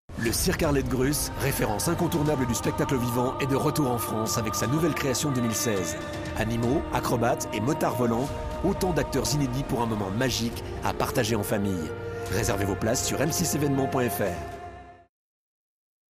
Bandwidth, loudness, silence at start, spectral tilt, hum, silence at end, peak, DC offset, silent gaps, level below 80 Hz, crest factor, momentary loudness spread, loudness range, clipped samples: 15.5 kHz; -26 LUFS; 0.1 s; -5 dB/octave; none; 1.15 s; -10 dBFS; under 0.1%; none; -42 dBFS; 16 dB; 5 LU; 2 LU; under 0.1%